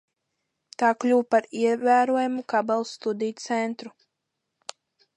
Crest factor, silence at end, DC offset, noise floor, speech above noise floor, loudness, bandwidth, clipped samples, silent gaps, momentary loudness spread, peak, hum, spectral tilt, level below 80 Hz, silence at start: 18 dB; 1.25 s; under 0.1%; -81 dBFS; 58 dB; -24 LUFS; 10.5 kHz; under 0.1%; none; 21 LU; -8 dBFS; none; -4.5 dB/octave; -82 dBFS; 0.8 s